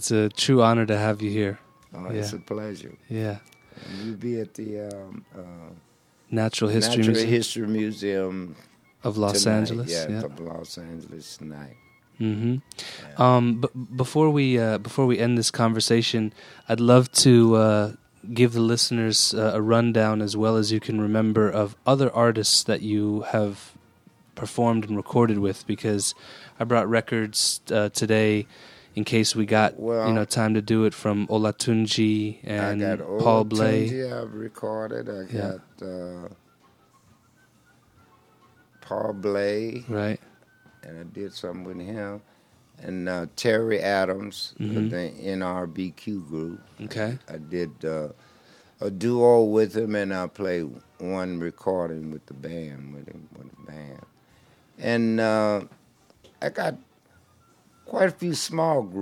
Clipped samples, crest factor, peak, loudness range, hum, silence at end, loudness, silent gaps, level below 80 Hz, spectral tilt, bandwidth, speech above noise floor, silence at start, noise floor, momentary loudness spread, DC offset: under 0.1%; 24 dB; -2 dBFS; 13 LU; none; 0 s; -24 LUFS; none; -66 dBFS; -5 dB/octave; 15.5 kHz; 36 dB; 0 s; -60 dBFS; 18 LU; under 0.1%